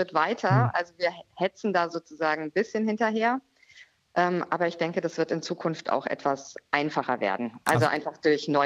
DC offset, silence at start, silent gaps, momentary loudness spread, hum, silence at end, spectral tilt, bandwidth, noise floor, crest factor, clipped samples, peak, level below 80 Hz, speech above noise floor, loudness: under 0.1%; 0 s; none; 7 LU; none; 0 s; -6 dB/octave; 14.5 kHz; -55 dBFS; 20 dB; under 0.1%; -6 dBFS; -72 dBFS; 29 dB; -27 LUFS